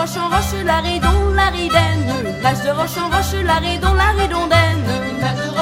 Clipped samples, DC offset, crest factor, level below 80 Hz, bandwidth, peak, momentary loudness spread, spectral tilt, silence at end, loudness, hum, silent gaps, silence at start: under 0.1%; under 0.1%; 16 dB; -24 dBFS; 16.5 kHz; 0 dBFS; 5 LU; -5 dB/octave; 0 s; -17 LUFS; none; none; 0 s